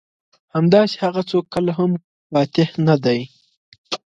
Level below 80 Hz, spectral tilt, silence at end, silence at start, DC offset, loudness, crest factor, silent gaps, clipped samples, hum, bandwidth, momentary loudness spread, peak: -58 dBFS; -7.5 dB/octave; 0.2 s; 0.55 s; under 0.1%; -19 LUFS; 18 dB; 2.04-2.30 s, 3.57-3.72 s, 3.78-3.84 s; under 0.1%; none; 7.8 kHz; 12 LU; -2 dBFS